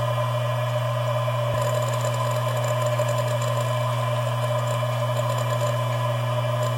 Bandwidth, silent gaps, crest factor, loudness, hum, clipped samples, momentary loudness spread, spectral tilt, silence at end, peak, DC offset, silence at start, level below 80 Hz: 17 kHz; none; 12 dB; -24 LUFS; none; under 0.1%; 1 LU; -5.5 dB/octave; 0 s; -10 dBFS; under 0.1%; 0 s; -56 dBFS